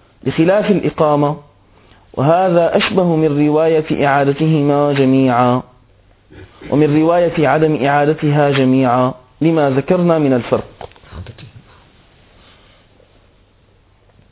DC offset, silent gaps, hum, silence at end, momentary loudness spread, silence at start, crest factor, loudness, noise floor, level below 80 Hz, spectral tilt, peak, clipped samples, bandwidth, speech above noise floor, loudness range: under 0.1%; none; none; 2.85 s; 8 LU; 0.25 s; 14 dB; -14 LUFS; -51 dBFS; -46 dBFS; -11.5 dB/octave; 0 dBFS; under 0.1%; 4 kHz; 38 dB; 5 LU